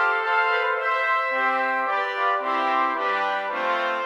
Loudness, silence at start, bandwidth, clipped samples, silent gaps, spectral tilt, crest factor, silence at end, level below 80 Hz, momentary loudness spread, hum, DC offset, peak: -22 LUFS; 0 s; 13.5 kHz; under 0.1%; none; -2.5 dB/octave; 14 dB; 0 s; -84 dBFS; 3 LU; none; under 0.1%; -8 dBFS